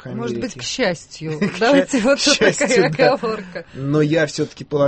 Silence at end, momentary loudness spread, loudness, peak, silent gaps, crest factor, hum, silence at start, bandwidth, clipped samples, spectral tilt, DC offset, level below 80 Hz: 0 s; 13 LU; -18 LUFS; -2 dBFS; none; 16 dB; none; 0.05 s; 8.8 kHz; under 0.1%; -4 dB/octave; under 0.1%; -50 dBFS